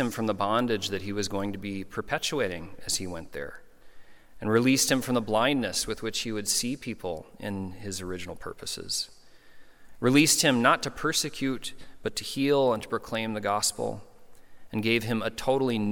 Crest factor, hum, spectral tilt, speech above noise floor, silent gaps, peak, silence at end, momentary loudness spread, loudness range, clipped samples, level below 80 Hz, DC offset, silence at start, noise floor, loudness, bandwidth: 22 dB; none; -3.5 dB/octave; 20 dB; none; -6 dBFS; 0 s; 15 LU; 7 LU; under 0.1%; -56 dBFS; under 0.1%; 0 s; -48 dBFS; -27 LUFS; 17.5 kHz